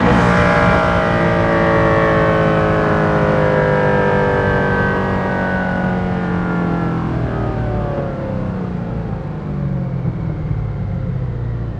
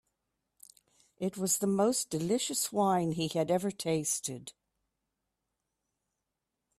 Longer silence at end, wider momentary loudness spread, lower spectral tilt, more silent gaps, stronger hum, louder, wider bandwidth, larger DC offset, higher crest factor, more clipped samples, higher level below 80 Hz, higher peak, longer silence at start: second, 0 s vs 2.25 s; about the same, 9 LU vs 10 LU; first, -8 dB/octave vs -4 dB/octave; neither; neither; first, -16 LUFS vs -31 LUFS; second, 9.4 kHz vs 15.5 kHz; neither; about the same, 16 dB vs 18 dB; neither; first, -30 dBFS vs -72 dBFS; first, 0 dBFS vs -16 dBFS; second, 0 s vs 1.2 s